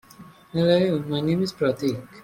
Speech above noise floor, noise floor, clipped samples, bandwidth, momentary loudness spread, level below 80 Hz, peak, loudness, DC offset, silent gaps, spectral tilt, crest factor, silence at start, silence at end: 25 dB; -48 dBFS; under 0.1%; 16.5 kHz; 8 LU; -58 dBFS; -6 dBFS; -23 LUFS; under 0.1%; none; -7 dB/octave; 18 dB; 0.2 s; 0 s